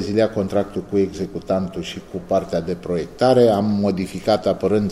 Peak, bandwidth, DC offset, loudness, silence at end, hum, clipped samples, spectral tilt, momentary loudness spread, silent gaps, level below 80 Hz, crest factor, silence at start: -2 dBFS; 13.5 kHz; under 0.1%; -20 LUFS; 0 s; none; under 0.1%; -7 dB/octave; 11 LU; none; -48 dBFS; 16 dB; 0 s